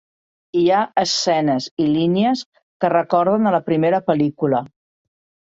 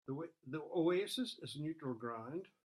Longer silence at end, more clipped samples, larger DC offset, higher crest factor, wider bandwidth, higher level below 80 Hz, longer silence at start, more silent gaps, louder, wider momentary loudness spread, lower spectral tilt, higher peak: first, 0.75 s vs 0.2 s; neither; neither; about the same, 16 dB vs 16 dB; second, 8 kHz vs 13.5 kHz; first, -62 dBFS vs -84 dBFS; first, 0.55 s vs 0.05 s; first, 1.71-1.77 s, 2.46-2.52 s, 2.63-2.80 s vs none; first, -18 LUFS vs -41 LUFS; second, 4 LU vs 11 LU; about the same, -5.5 dB/octave vs -5.5 dB/octave; first, -2 dBFS vs -24 dBFS